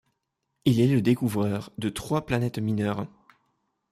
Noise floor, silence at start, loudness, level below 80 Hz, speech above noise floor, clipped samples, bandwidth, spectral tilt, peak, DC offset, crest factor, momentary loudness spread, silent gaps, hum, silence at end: -79 dBFS; 0.65 s; -26 LUFS; -56 dBFS; 55 dB; under 0.1%; 15.5 kHz; -7 dB/octave; -8 dBFS; under 0.1%; 18 dB; 10 LU; none; none; 0.85 s